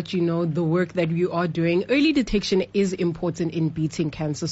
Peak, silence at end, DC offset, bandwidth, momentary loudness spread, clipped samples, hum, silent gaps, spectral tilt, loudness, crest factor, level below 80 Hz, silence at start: -10 dBFS; 0 s; under 0.1%; 8 kHz; 6 LU; under 0.1%; none; none; -6 dB/octave; -23 LUFS; 14 dB; -46 dBFS; 0 s